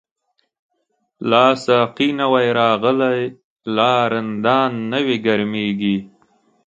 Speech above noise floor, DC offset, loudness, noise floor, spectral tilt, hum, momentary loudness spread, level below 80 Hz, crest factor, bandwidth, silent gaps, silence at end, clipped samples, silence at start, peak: 53 dB; under 0.1%; -17 LUFS; -70 dBFS; -6 dB/octave; none; 9 LU; -62 dBFS; 18 dB; 8.8 kHz; 3.44-3.56 s; 0.6 s; under 0.1%; 1.2 s; 0 dBFS